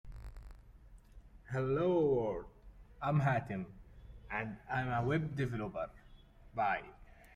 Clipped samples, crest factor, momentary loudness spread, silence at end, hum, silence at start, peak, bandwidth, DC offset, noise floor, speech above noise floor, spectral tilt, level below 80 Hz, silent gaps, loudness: under 0.1%; 18 dB; 22 LU; 0.25 s; none; 0.05 s; -20 dBFS; 9.8 kHz; under 0.1%; -58 dBFS; 23 dB; -8.5 dB/octave; -56 dBFS; none; -36 LUFS